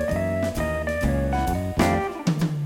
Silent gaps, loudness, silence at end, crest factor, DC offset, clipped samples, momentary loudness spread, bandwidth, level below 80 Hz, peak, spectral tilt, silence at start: none; -24 LUFS; 0 s; 18 dB; under 0.1%; under 0.1%; 3 LU; 17.5 kHz; -32 dBFS; -6 dBFS; -6.5 dB/octave; 0 s